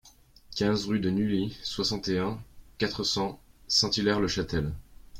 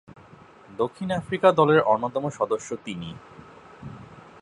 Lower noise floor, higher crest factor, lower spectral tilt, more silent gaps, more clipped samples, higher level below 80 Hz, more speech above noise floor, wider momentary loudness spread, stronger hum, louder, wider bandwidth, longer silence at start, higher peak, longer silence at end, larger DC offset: first, -55 dBFS vs -50 dBFS; about the same, 20 dB vs 22 dB; second, -4.5 dB/octave vs -6 dB/octave; neither; neither; first, -50 dBFS vs -60 dBFS; about the same, 27 dB vs 26 dB; second, 11 LU vs 24 LU; neither; second, -28 LUFS vs -23 LUFS; first, 16 kHz vs 11 kHz; second, 0.05 s vs 0.7 s; second, -10 dBFS vs -2 dBFS; second, 0 s vs 0.2 s; neither